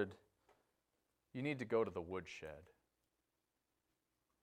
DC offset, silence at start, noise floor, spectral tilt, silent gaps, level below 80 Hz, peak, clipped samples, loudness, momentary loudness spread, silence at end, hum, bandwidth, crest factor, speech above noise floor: under 0.1%; 0 s; -88 dBFS; -6.5 dB/octave; none; -76 dBFS; -24 dBFS; under 0.1%; -44 LUFS; 15 LU; 1.8 s; none; 10 kHz; 22 dB; 45 dB